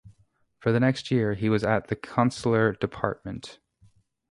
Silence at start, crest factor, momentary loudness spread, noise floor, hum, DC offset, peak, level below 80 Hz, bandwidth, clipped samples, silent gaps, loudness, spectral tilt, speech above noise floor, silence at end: 0.05 s; 22 dB; 12 LU; -65 dBFS; none; under 0.1%; -4 dBFS; -54 dBFS; 11.5 kHz; under 0.1%; none; -26 LUFS; -7 dB/octave; 40 dB; 0.8 s